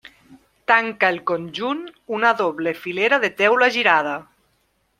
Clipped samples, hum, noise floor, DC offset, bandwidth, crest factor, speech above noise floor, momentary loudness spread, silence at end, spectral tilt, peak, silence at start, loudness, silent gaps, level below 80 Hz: under 0.1%; none; -66 dBFS; under 0.1%; 15.5 kHz; 20 dB; 46 dB; 12 LU; 0.8 s; -4 dB/octave; -2 dBFS; 0.3 s; -19 LUFS; none; -68 dBFS